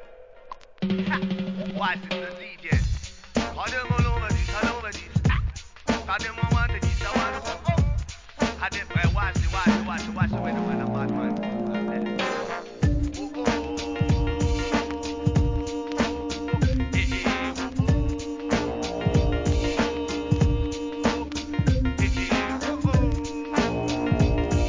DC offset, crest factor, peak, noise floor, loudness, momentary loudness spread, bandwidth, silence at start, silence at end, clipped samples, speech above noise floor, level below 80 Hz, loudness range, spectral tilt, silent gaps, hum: 0.2%; 16 dB; -8 dBFS; -46 dBFS; -26 LUFS; 7 LU; 7.6 kHz; 0 s; 0 s; under 0.1%; 18 dB; -30 dBFS; 2 LU; -6 dB/octave; none; none